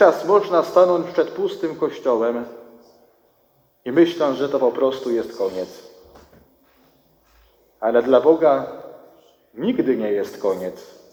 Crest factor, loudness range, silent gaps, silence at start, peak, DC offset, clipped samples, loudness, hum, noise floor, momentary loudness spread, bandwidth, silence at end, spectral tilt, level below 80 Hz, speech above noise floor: 20 dB; 5 LU; none; 0 s; 0 dBFS; under 0.1%; under 0.1%; -20 LUFS; none; -61 dBFS; 15 LU; 18 kHz; 0.25 s; -6 dB/octave; -64 dBFS; 42 dB